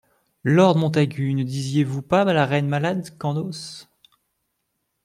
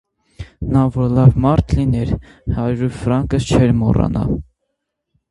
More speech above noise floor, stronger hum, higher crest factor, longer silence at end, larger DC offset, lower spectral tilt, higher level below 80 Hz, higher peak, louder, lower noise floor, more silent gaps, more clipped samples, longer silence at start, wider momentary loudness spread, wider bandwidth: second, 55 dB vs 60 dB; neither; about the same, 18 dB vs 16 dB; first, 1.2 s vs 0.9 s; neither; about the same, -7 dB/octave vs -8 dB/octave; second, -62 dBFS vs -28 dBFS; second, -4 dBFS vs 0 dBFS; second, -21 LUFS vs -16 LUFS; about the same, -75 dBFS vs -75 dBFS; neither; neither; about the same, 0.45 s vs 0.4 s; about the same, 13 LU vs 12 LU; first, 13 kHz vs 11.5 kHz